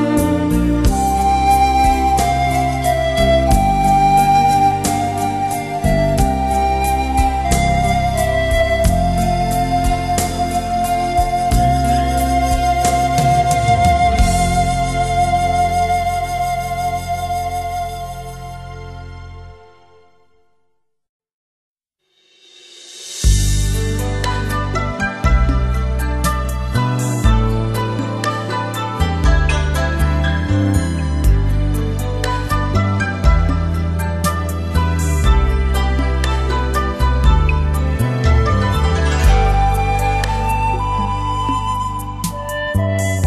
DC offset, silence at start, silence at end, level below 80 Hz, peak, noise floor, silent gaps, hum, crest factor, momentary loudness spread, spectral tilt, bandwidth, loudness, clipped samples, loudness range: 0.1%; 0 s; 0 s; -20 dBFS; -2 dBFS; -67 dBFS; 21.09-21.20 s, 21.33-21.75 s; none; 14 dB; 7 LU; -5.5 dB/octave; 13.5 kHz; -17 LUFS; under 0.1%; 7 LU